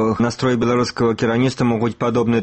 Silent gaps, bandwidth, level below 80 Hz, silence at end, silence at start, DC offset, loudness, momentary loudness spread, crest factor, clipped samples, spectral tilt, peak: none; 8.8 kHz; -48 dBFS; 0 s; 0 s; under 0.1%; -18 LUFS; 2 LU; 12 dB; under 0.1%; -6.5 dB/octave; -6 dBFS